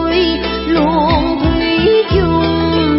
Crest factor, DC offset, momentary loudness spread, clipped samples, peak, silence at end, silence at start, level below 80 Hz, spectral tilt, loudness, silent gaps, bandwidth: 12 dB; under 0.1%; 3 LU; under 0.1%; -2 dBFS; 0 s; 0 s; -26 dBFS; -10 dB/octave; -13 LUFS; none; 5.8 kHz